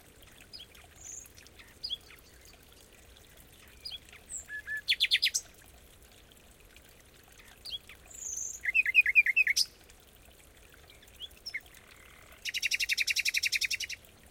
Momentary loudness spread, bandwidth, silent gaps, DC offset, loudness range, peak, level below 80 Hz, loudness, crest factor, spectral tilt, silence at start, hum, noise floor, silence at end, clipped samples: 23 LU; 17 kHz; none; under 0.1%; 17 LU; -12 dBFS; -62 dBFS; -28 LUFS; 22 dB; 2 dB/octave; 0.2 s; none; -57 dBFS; 0.35 s; under 0.1%